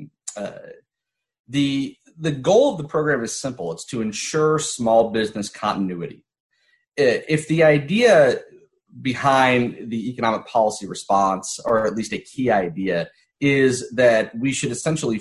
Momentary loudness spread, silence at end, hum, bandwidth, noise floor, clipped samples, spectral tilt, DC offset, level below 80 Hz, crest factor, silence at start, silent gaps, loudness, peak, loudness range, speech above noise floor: 13 LU; 0 s; none; 12 kHz; -84 dBFS; under 0.1%; -5 dB/octave; under 0.1%; -58 dBFS; 16 dB; 0 s; 1.39-1.44 s, 6.40-6.50 s; -20 LUFS; -4 dBFS; 4 LU; 64 dB